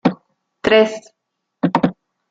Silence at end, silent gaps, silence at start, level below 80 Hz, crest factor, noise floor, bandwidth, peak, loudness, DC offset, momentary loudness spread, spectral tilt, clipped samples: 0.4 s; none; 0.05 s; -54 dBFS; 18 dB; -76 dBFS; 8 kHz; 0 dBFS; -17 LUFS; under 0.1%; 16 LU; -6 dB/octave; under 0.1%